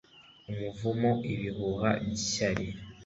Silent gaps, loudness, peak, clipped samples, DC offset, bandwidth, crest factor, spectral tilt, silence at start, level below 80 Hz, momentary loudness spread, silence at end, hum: none; -31 LUFS; -12 dBFS; under 0.1%; under 0.1%; 8 kHz; 20 dB; -5 dB/octave; 0.15 s; -54 dBFS; 10 LU; 0 s; none